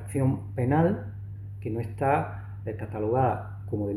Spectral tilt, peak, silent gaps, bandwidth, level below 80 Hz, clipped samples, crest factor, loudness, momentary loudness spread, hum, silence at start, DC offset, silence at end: -9 dB/octave; -10 dBFS; none; 12.5 kHz; -52 dBFS; under 0.1%; 16 dB; -28 LUFS; 13 LU; none; 0 s; under 0.1%; 0 s